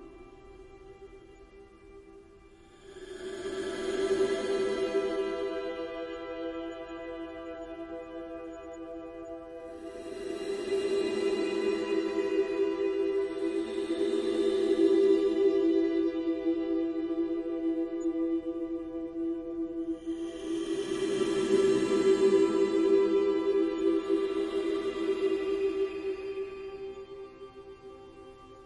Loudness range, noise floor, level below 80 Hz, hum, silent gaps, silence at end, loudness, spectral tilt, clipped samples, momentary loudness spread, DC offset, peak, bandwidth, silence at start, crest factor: 13 LU; -55 dBFS; -60 dBFS; none; none; 0 s; -30 LUFS; -5 dB/octave; under 0.1%; 18 LU; under 0.1%; -14 dBFS; 11 kHz; 0 s; 16 dB